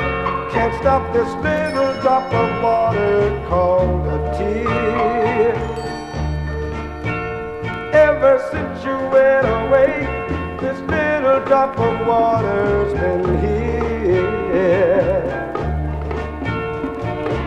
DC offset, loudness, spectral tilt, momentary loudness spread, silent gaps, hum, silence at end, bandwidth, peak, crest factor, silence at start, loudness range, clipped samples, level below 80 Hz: under 0.1%; -18 LUFS; -7.5 dB/octave; 9 LU; none; none; 0 s; 9.8 kHz; -2 dBFS; 16 dB; 0 s; 3 LU; under 0.1%; -30 dBFS